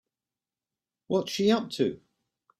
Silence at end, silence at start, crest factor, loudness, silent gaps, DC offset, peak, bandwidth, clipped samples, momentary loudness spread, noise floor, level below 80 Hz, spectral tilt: 0.65 s; 1.1 s; 18 dB; -28 LUFS; none; under 0.1%; -12 dBFS; 14.5 kHz; under 0.1%; 5 LU; under -90 dBFS; -70 dBFS; -5.5 dB/octave